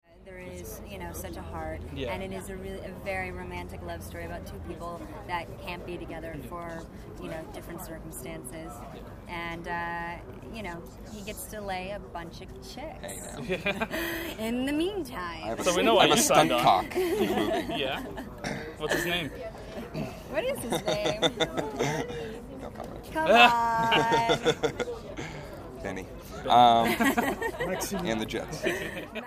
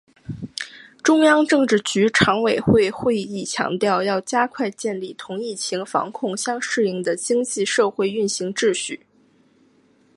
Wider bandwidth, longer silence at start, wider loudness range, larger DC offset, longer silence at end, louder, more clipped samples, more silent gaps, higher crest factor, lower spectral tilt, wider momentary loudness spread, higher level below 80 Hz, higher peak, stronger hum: first, 15.5 kHz vs 11.5 kHz; second, 0.15 s vs 0.3 s; first, 14 LU vs 5 LU; neither; second, 0 s vs 1.2 s; second, -28 LUFS vs -20 LUFS; neither; neither; first, 26 dB vs 20 dB; about the same, -3.5 dB/octave vs -4 dB/octave; first, 19 LU vs 14 LU; first, -48 dBFS vs -54 dBFS; about the same, -4 dBFS vs -2 dBFS; neither